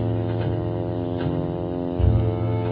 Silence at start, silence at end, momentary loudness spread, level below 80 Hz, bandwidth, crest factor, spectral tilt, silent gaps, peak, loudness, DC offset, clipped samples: 0 s; 0 s; 6 LU; -32 dBFS; 4.5 kHz; 16 dB; -12 dB/octave; none; -8 dBFS; -24 LUFS; under 0.1%; under 0.1%